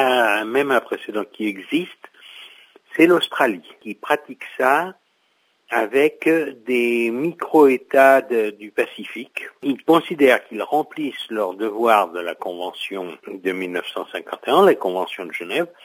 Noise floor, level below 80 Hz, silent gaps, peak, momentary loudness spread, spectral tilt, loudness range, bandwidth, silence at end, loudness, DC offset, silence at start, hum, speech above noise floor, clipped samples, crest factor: -64 dBFS; -76 dBFS; none; 0 dBFS; 15 LU; -4.5 dB/octave; 5 LU; 16 kHz; 0.2 s; -20 LUFS; under 0.1%; 0 s; none; 45 dB; under 0.1%; 20 dB